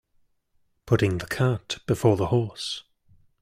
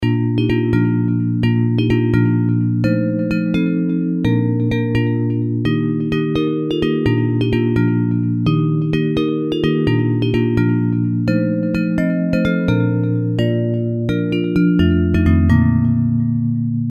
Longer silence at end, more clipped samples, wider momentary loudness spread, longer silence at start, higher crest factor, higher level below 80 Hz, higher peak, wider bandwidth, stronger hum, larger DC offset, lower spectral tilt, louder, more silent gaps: first, 0.6 s vs 0 s; neither; first, 10 LU vs 4 LU; first, 0.85 s vs 0 s; about the same, 20 dB vs 16 dB; second, -52 dBFS vs -36 dBFS; second, -6 dBFS vs 0 dBFS; first, 15.5 kHz vs 6.6 kHz; neither; neither; second, -6 dB/octave vs -9 dB/octave; second, -25 LUFS vs -17 LUFS; neither